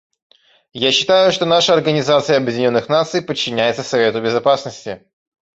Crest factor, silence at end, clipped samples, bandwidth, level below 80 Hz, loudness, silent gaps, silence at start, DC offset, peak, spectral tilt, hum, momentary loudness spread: 16 dB; 0.6 s; under 0.1%; 8 kHz; -58 dBFS; -15 LUFS; none; 0.75 s; under 0.1%; -2 dBFS; -4 dB/octave; none; 11 LU